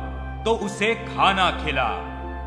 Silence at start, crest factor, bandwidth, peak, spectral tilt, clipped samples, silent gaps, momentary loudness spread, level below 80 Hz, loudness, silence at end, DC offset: 0 s; 20 dB; 11 kHz; -4 dBFS; -4.5 dB/octave; under 0.1%; none; 12 LU; -36 dBFS; -22 LUFS; 0 s; under 0.1%